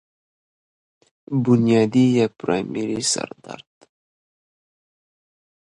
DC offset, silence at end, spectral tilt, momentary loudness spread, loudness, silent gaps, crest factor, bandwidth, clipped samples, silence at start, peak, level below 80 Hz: under 0.1%; 2.05 s; -5.5 dB/octave; 19 LU; -20 LUFS; none; 20 dB; 11.5 kHz; under 0.1%; 1.3 s; -4 dBFS; -62 dBFS